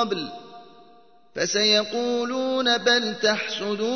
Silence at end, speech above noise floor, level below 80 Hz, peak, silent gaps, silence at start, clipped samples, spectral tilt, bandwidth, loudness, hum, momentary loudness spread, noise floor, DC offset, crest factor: 0 s; 31 dB; -70 dBFS; -6 dBFS; none; 0 s; under 0.1%; -2 dB/octave; 6.6 kHz; -22 LUFS; none; 12 LU; -55 dBFS; 0.2%; 18 dB